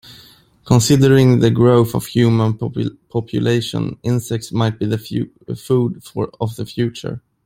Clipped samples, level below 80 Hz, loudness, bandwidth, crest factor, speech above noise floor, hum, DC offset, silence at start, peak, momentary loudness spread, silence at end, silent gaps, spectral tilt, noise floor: under 0.1%; -46 dBFS; -17 LUFS; 16 kHz; 16 dB; 31 dB; none; under 0.1%; 0.1 s; 0 dBFS; 13 LU; 0.3 s; none; -6.5 dB/octave; -47 dBFS